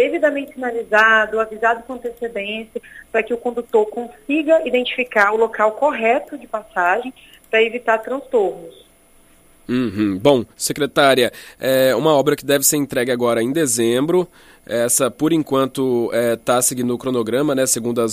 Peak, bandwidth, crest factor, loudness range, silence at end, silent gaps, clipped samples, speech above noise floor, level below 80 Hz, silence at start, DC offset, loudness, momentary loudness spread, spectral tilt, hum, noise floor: 0 dBFS; 15.5 kHz; 18 dB; 5 LU; 0 s; none; under 0.1%; 33 dB; -54 dBFS; 0 s; under 0.1%; -18 LUFS; 10 LU; -3.5 dB/octave; none; -51 dBFS